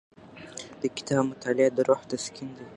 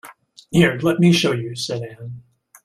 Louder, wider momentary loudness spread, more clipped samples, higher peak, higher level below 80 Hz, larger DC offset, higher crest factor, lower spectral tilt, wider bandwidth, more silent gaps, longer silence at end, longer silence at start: second, -27 LUFS vs -18 LUFS; about the same, 17 LU vs 18 LU; neither; second, -8 dBFS vs -2 dBFS; second, -68 dBFS vs -52 dBFS; neither; about the same, 20 dB vs 18 dB; about the same, -5 dB/octave vs -5.5 dB/octave; second, 11 kHz vs 14 kHz; neither; second, 0 s vs 0.45 s; first, 0.25 s vs 0.05 s